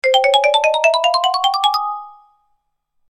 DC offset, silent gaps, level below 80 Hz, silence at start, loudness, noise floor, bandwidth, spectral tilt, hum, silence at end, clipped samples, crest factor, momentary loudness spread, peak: under 0.1%; none; -70 dBFS; 0.05 s; -15 LUFS; -68 dBFS; 14 kHz; 3.5 dB/octave; none; 1 s; under 0.1%; 16 dB; 9 LU; -2 dBFS